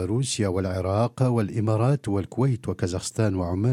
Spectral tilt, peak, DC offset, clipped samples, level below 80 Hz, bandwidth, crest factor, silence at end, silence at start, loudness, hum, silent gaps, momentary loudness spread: -6.5 dB/octave; -8 dBFS; under 0.1%; under 0.1%; -52 dBFS; 12.5 kHz; 16 dB; 0 s; 0 s; -25 LUFS; none; none; 5 LU